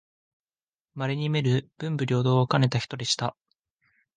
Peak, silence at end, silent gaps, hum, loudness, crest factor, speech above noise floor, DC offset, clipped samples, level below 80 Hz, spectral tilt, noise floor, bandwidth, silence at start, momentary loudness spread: -6 dBFS; 0.85 s; none; none; -26 LUFS; 20 dB; over 65 dB; under 0.1%; under 0.1%; -62 dBFS; -5.5 dB/octave; under -90 dBFS; 9.6 kHz; 0.95 s; 10 LU